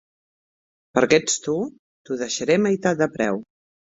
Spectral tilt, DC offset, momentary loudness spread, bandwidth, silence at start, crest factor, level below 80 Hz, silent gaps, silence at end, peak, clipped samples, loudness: -4 dB/octave; under 0.1%; 12 LU; 8 kHz; 0.95 s; 22 dB; -60 dBFS; 1.79-2.05 s; 0.55 s; -2 dBFS; under 0.1%; -22 LUFS